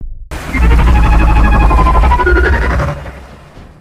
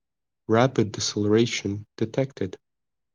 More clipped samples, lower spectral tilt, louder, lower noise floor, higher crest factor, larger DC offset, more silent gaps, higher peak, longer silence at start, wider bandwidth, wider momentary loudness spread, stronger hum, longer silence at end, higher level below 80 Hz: neither; first, -7 dB/octave vs -5 dB/octave; first, -11 LUFS vs -25 LUFS; second, -34 dBFS vs -88 dBFS; second, 10 dB vs 20 dB; neither; neither; first, 0 dBFS vs -6 dBFS; second, 0 s vs 0.5 s; about the same, 9.6 kHz vs 10 kHz; first, 16 LU vs 12 LU; neither; second, 0.15 s vs 0.6 s; first, -12 dBFS vs -68 dBFS